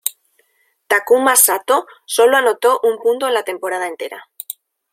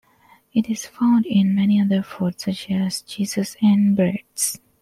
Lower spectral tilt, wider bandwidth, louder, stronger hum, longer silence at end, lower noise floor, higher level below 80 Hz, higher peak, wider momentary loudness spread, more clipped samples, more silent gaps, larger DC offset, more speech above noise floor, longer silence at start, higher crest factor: second, 0.5 dB/octave vs -5.5 dB/octave; about the same, 16.5 kHz vs 15 kHz; first, -15 LUFS vs -20 LUFS; neither; first, 0.4 s vs 0.25 s; first, -63 dBFS vs -55 dBFS; second, -70 dBFS vs -62 dBFS; first, 0 dBFS vs -8 dBFS; first, 19 LU vs 8 LU; neither; neither; neither; first, 47 dB vs 35 dB; second, 0.05 s vs 0.55 s; about the same, 16 dB vs 14 dB